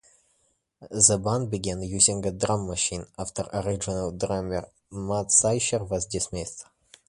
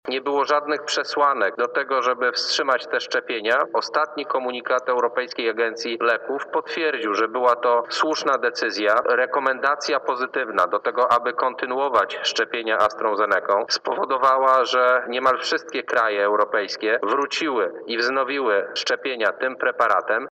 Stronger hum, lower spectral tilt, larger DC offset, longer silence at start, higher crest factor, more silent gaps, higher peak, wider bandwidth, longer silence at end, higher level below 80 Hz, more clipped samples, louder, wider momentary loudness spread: neither; first, -3.5 dB/octave vs -2 dB/octave; neither; first, 0.8 s vs 0.05 s; first, 26 dB vs 14 dB; neither; first, -2 dBFS vs -8 dBFS; first, 11.5 kHz vs 9 kHz; first, 0.45 s vs 0.05 s; first, -48 dBFS vs -74 dBFS; neither; second, -25 LUFS vs -21 LUFS; first, 15 LU vs 5 LU